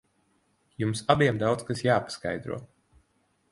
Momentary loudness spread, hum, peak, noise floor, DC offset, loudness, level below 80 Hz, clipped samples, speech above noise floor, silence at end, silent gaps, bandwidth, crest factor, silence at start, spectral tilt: 12 LU; none; -6 dBFS; -70 dBFS; under 0.1%; -27 LUFS; -58 dBFS; under 0.1%; 44 dB; 0.85 s; none; 11.5 kHz; 24 dB; 0.8 s; -5.5 dB/octave